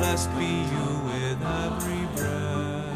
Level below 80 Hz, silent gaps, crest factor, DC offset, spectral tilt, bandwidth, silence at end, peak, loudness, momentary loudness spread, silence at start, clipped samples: -42 dBFS; none; 14 dB; 0.1%; -5 dB/octave; 15.5 kHz; 0 s; -12 dBFS; -28 LUFS; 3 LU; 0 s; under 0.1%